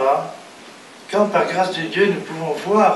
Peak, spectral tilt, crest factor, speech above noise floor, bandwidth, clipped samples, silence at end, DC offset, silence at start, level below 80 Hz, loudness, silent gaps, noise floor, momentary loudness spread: -2 dBFS; -5 dB/octave; 18 dB; 23 dB; 12 kHz; under 0.1%; 0 s; under 0.1%; 0 s; -68 dBFS; -19 LUFS; none; -41 dBFS; 22 LU